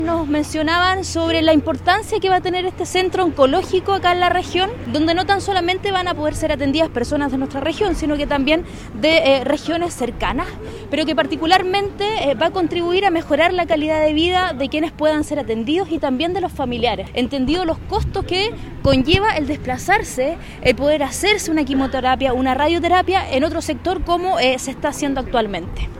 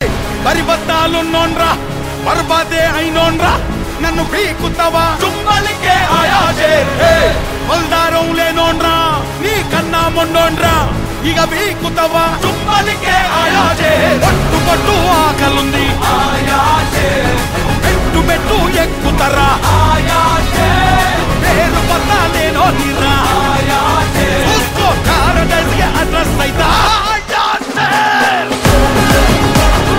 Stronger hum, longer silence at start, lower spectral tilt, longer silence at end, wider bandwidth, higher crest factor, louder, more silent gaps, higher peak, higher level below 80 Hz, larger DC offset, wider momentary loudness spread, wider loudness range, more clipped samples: neither; about the same, 0 s vs 0 s; about the same, -4.5 dB/octave vs -4.5 dB/octave; about the same, 0 s vs 0 s; about the same, 16 kHz vs 16.5 kHz; first, 18 dB vs 12 dB; second, -18 LUFS vs -11 LUFS; neither; about the same, 0 dBFS vs 0 dBFS; second, -34 dBFS vs -20 dBFS; neither; first, 7 LU vs 4 LU; about the same, 2 LU vs 2 LU; neither